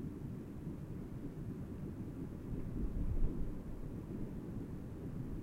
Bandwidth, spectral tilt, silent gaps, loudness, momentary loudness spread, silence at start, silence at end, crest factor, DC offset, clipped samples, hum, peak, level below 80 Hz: 13 kHz; -9.5 dB/octave; none; -45 LUFS; 5 LU; 0 s; 0 s; 18 dB; under 0.1%; under 0.1%; none; -22 dBFS; -44 dBFS